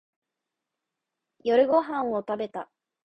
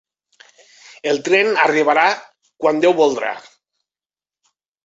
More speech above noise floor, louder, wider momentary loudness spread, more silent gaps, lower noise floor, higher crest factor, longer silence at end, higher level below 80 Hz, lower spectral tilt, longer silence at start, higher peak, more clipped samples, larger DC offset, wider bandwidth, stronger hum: second, 61 dB vs over 74 dB; second, -26 LUFS vs -16 LUFS; first, 16 LU vs 12 LU; neither; second, -86 dBFS vs under -90 dBFS; about the same, 18 dB vs 18 dB; second, 0.4 s vs 1.45 s; about the same, -72 dBFS vs -68 dBFS; first, -7 dB/octave vs -3.5 dB/octave; first, 1.45 s vs 1.05 s; second, -10 dBFS vs -2 dBFS; neither; neither; second, 6 kHz vs 8 kHz; neither